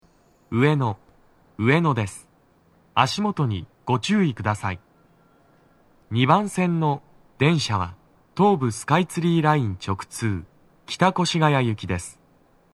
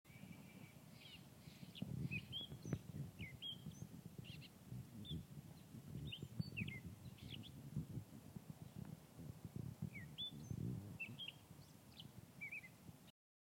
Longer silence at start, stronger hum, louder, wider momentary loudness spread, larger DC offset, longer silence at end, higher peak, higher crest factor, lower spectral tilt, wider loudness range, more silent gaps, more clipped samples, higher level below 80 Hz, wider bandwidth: first, 0.5 s vs 0.05 s; neither; first, -23 LUFS vs -53 LUFS; about the same, 12 LU vs 12 LU; neither; first, 0.65 s vs 0.3 s; first, -2 dBFS vs -30 dBFS; about the same, 22 dB vs 22 dB; about the same, -6 dB/octave vs -5 dB/octave; about the same, 3 LU vs 3 LU; neither; neither; first, -56 dBFS vs -70 dBFS; second, 13 kHz vs 16.5 kHz